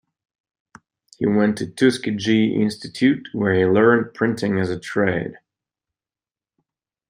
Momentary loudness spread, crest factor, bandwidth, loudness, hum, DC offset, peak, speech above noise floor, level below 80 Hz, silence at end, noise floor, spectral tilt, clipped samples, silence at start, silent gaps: 8 LU; 18 dB; 15 kHz; -20 LUFS; none; under 0.1%; -2 dBFS; over 71 dB; -60 dBFS; 1.75 s; under -90 dBFS; -6.5 dB/octave; under 0.1%; 1.2 s; none